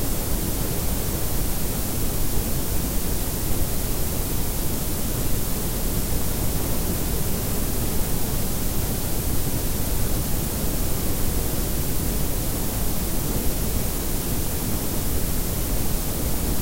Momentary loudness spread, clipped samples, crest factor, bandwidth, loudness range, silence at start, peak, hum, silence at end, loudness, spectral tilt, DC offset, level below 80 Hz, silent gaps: 1 LU; under 0.1%; 14 dB; 16 kHz; 0 LU; 0 s; -8 dBFS; none; 0 s; -25 LUFS; -4.5 dB/octave; under 0.1%; -28 dBFS; none